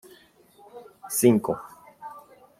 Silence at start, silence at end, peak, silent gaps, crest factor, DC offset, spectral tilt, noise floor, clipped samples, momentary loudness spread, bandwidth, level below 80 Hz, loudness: 0.75 s; 0.4 s; -6 dBFS; none; 22 dB; under 0.1%; -5.5 dB/octave; -56 dBFS; under 0.1%; 26 LU; 16.5 kHz; -64 dBFS; -23 LUFS